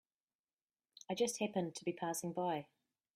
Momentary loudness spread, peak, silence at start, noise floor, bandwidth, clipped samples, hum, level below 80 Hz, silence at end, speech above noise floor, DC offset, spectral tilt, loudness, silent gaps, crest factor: 8 LU; -24 dBFS; 1.1 s; under -90 dBFS; 15.5 kHz; under 0.1%; none; -84 dBFS; 0.5 s; over 51 dB; under 0.1%; -4.5 dB/octave; -40 LUFS; none; 18 dB